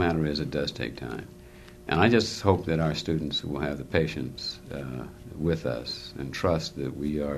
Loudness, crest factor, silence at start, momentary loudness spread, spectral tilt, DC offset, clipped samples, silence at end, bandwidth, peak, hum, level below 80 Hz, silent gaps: -28 LUFS; 24 dB; 0 s; 14 LU; -6 dB/octave; under 0.1%; under 0.1%; 0 s; 13.5 kHz; -4 dBFS; none; -46 dBFS; none